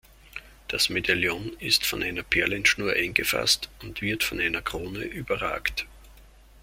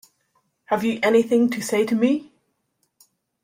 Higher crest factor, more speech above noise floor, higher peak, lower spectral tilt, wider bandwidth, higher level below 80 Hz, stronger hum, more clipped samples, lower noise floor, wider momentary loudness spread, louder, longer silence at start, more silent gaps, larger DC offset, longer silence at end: first, 24 dB vs 16 dB; second, 25 dB vs 52 dB; about the same, -4 dBFS vs -6 dBFS; second, -2.5 dB/octave vs -5 dB/octave; about the same, 16.5 kHz vs 16 kHz; first, -48 dBFS vs -68 dBFS; neither; neither; second, -52 dBFS vs -72 dBFS; first, 13 LU vs 7 LU; second, -25 LUFS vs -21 LUFS; second, 0.25 s vs 0.7 s; neither; neither; second, 0.05 s vs 1.2 s